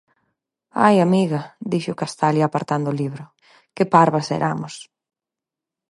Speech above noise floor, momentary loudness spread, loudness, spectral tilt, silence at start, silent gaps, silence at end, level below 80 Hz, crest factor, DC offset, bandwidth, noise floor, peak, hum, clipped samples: 69 dB; 14 LU; -20 LUFS; -6.5 dB/octave; 0.75 s; none; 1.05 s; -66 dBFS; 20 dB; under 0.1%; 11.5 kHz; -88 dBFS; 0 dBFS; none; under 0.1%